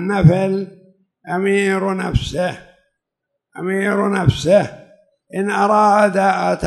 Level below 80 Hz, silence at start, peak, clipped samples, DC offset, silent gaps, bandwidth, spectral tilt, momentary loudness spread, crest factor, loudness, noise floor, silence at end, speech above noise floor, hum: -38 dBFS; 0 s; 0 dBFS; under 0.1%; under 0.1%; none; 12 kHz; -6.5 dB/octave; 12 LU; 18 dB; -17 LUFS; -78 dBFS; 0 s; 62 dB; none